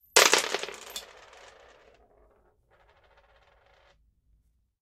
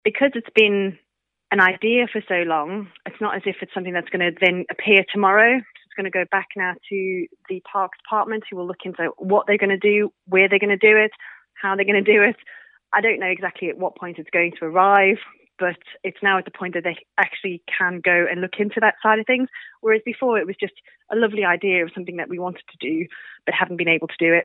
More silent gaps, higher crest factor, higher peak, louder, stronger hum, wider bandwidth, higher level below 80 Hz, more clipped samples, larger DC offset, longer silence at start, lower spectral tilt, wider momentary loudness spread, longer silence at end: neither; first, 32 dB vs 20 dB; about the same, -2 dBFS vs -2 dBFS; second, -24 LUFS vs -20 LUFS; neither; first, 16 kHz vs 4.1 kHz; first, -68 dBFS vs -78 dBFS; neither; neither; about the same, 0.15 s vs 0.05 s; second, 1 dB/octave vs -7 dB/octave; first, 29 LU vs 14 LU; first, 3.8 s vs 0 s